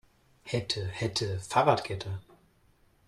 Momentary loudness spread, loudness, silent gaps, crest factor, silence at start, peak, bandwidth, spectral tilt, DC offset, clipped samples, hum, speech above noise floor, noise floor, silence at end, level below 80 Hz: 14 LU; -30 LUFS; none; 24 dB; 0.45 s; -8 dBFS; 13 kHz; -4.5 dB/octave; under 0.1%; under 0.1%; none; 35 dB; -65 dBFS; 0.85 s; -60 dBFS